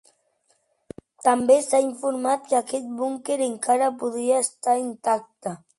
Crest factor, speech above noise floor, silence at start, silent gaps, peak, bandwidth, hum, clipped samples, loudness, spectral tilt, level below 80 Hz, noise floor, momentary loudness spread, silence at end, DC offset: 18 dB; 45 dB; 1.2 s; none; -6 dBFS; 11.5 kHz; none; under 0.1%; -23 LUFS; -3.5 dB/octave; -70 dBFS; -68 dBFS; 10 LU; 0.2 s; under 0.1%